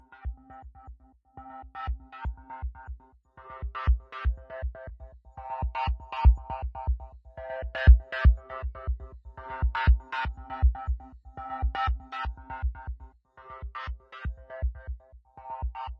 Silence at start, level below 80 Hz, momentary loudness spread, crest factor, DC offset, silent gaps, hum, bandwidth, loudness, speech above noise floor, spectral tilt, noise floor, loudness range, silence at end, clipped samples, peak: 0.1 s; -30 dBFS; 22 LU; 24 dB; under 0.1%; none; none; 5.2 kHz; -30 LUFS; 18 dB; -8.5 dB/octave; -51 dBFS; 12 LU; 0.05 s; under 0.1%; -4 dBFS